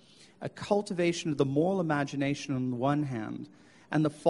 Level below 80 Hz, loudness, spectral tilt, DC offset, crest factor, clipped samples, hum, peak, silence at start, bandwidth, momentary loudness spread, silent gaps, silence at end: -66 dBFS; -30 LUFS; -6.5 dB/octave; under 0.1%; 18 dB; under 0.1%; none; -12 dBFS; 0.2 s; 11.5 kHz; 13 LU; none; 0 s